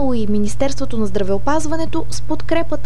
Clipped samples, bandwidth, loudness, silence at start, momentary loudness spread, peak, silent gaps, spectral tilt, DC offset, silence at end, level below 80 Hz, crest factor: under 0.1%; 12.5 kHz; -21 LUFS; 0 s; 5 LU; -2 dBFS; none; -5.5 dB/octave; 30%; 0 s; -32 dBFS; 14 dB